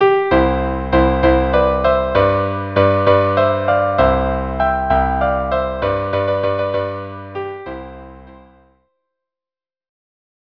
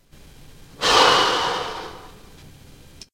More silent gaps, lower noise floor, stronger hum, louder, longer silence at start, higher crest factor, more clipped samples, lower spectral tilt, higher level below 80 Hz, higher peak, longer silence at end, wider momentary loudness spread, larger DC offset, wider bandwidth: neither; first, under -90 dBFS vs -46 dBFS; neither; about the same, -16 LUFS vs -18 LUFS; second, 0 s vs 0.8 s; second, 16 dB vs 22 dB; neither; first, -9 dB/octave vs -1.5 dB/octave; first, -28 dBFS vs -48 dBFS; about the same, 0 dBFS vs 0 dBFS; first, 2.25 s vs 0.65 s; second, 14 LU vs 19 LU; neither; second, 5.4 kHz vs 16 kHz